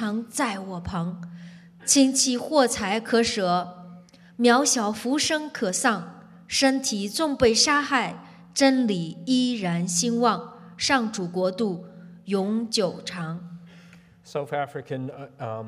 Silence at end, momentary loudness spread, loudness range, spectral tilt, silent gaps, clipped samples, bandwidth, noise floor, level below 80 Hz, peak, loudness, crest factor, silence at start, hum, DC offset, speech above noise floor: 0 s; 15 LU; 7 LU; -3 dB/octave; none; under 0.1%; 15 kHz; -51 dBFS; -58 dBFS; -6 dBFS; -24 LUFS; 20 dB; 0 s; none; under 0.1%; 27 dB